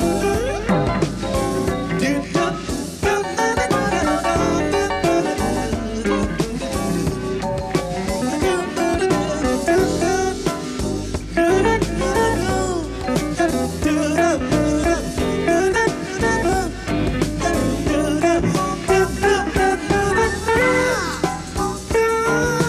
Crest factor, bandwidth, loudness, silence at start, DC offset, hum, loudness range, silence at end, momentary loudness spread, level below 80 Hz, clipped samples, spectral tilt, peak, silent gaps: 16 dB; 15 kHz; -20 LUFS; 0 s; under 0.1%; none; 3 LU; 0 s; 6 LU; -32 dBFS; under 0.1%; -5 dB/octave; -4 dBFS; none